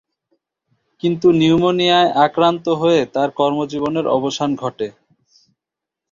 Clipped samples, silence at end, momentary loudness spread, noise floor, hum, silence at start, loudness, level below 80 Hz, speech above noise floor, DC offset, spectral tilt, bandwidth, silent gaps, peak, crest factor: under 0.1%; 1.2 s; 9 LU; -85 dBFS; none; 1.05 s; -16 LUFS; -56 dBFS; 69 dB; under 0.1%; -6 dB/octave; 7.4 kHz; none; -2 dBFS; 16 dB